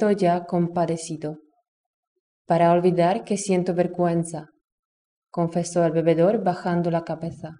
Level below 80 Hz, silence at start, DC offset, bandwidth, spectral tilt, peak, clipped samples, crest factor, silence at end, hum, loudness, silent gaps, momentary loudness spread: -66 dBFS; 0 s; under 0.1%; 10 kHz; -6.5 dB/octave; -8 dBFS; under 0.1%; 16 dB; 0.05 s; none; -23 LUFS; 1.68-2.45 s, 4.72-5.22 s; 13 LU